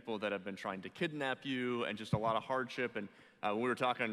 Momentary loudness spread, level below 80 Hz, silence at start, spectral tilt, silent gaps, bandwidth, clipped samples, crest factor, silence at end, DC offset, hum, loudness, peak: 8 LU; -74 dBFS; 0.05 s; -6 dB/octave; none; 13.5 kHz; under 0.1%; 18 dB; 0 s; under 0.1%; none; -38 LUFS; -20 dBFS